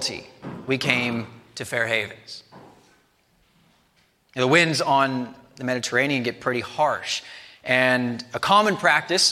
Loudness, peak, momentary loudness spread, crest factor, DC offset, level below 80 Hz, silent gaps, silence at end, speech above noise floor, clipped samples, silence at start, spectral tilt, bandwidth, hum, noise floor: -22 LUFS; -2 dBFS; 19 LU; 22 dB; under 0.1%; -66 dBFS; none; 0 s; 41 dB; under 0.1%; 0 s; -3.5 dB/octave; 16 kHz; none; -63 dBFS